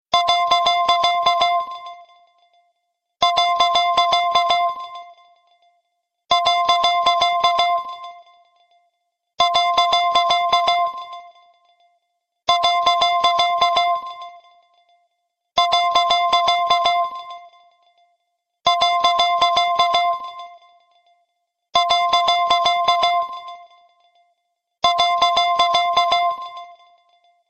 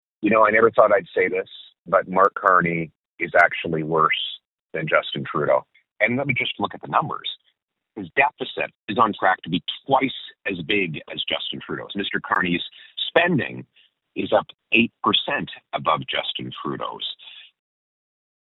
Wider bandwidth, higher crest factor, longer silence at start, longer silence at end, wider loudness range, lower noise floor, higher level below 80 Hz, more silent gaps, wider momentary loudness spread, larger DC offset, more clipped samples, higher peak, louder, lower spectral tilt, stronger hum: first, 13.5 kHz vs 7.2 kHz; about the same, 16 dB vs 20 dB; about the same, 0.1 s vs 0.2 s; second, 0.75 s vs 1.1 s; second, 0 LU vs 4 LU; first, -74 dBFS vs -70 dBFS; about the same, -58 dBFS vs -62 dBFS; second, none vs 1.79-1.85 s, 2.95-3.18 s, 4.45-4.69 s, 5.91-5.96 s, 7.64-7.68 s, 8.75-8.88 s, 14.54-14.58 s; first, 17 LU vs 13 LU; neither; neither; about the same, -2 dBFS vs -2 dBFS; first, -17 LUFS vs -22 LUFS; second, -0.5 dB/octave vs -7 dB/octave; neither